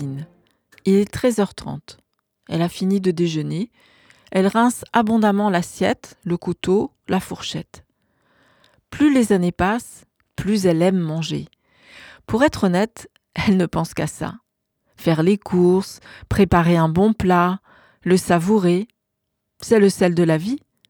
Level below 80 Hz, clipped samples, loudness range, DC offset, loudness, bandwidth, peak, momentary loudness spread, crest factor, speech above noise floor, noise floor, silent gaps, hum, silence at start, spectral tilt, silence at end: -44 dBFS; under 0.1%; 5 LU; under 0.1%; -19 LUFS; 19 kHz; -2 dBFS; 14 LU; 18 dB; 58 dB; -77 dBFS; none; none; 0 s; -6.5 dB/octave; 0.3 s